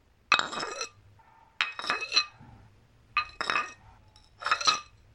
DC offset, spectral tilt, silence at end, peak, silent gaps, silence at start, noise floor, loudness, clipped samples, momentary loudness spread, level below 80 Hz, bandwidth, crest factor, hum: under 0.1%; 0 dB/octave; 0.3 s; -6 dBFS; none; 0.3 s; -59 dBFS; -29 LUFS; under 0.1%; 12 LU; -64 dBFS; 13 kHz; 28 dB; none